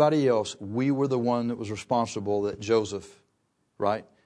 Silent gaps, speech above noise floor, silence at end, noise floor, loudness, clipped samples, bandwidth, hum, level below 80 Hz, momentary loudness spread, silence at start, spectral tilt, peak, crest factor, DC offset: none; 47 dB; 0.25 s; -73 dBFS; -27 LUFS; under 0.1%; 10.5 kHz; none; -66 dBFS; 7 LU; 0 s; -6 dB/octave; -8 dBFS; 20 dB; under 0.1%